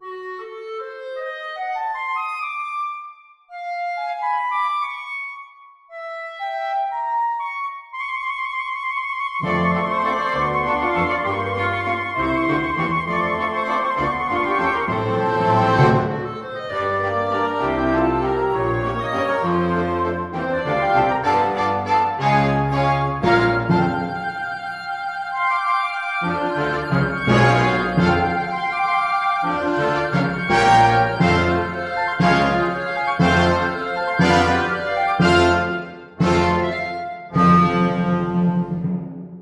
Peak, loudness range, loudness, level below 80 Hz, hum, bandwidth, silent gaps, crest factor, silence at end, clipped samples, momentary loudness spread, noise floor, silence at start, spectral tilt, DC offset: -2 dBFS; 8 LU; -20 LUFS; -44 dBFS; none; 11.5 kHz; none; 18 dB; 0 s; under 0.1%; 12 LU; -46 dBFS; 0 s; -6.5 dB/octave; under 0.1%